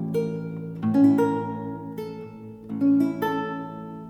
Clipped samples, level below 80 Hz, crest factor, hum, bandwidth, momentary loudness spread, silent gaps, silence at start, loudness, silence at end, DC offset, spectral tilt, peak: under 0.1%; -62 dBFS; 16 dB; none; 12.5 kHz; 17 LU; none; 0 s; -25 LUFS; 0 s; under 0.1%; -8.5 dB/octave; -8 dBFS